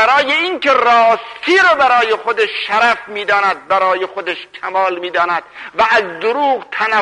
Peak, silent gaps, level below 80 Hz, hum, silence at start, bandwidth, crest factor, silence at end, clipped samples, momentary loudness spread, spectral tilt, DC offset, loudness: -2 dBFS; none; -56 dBFS; none; 0 s; 11 kHz; 12 dB; 0 s; under 0.1%; 9 LU; -2.5 dB/octave; under 0.1%; -14 LUFS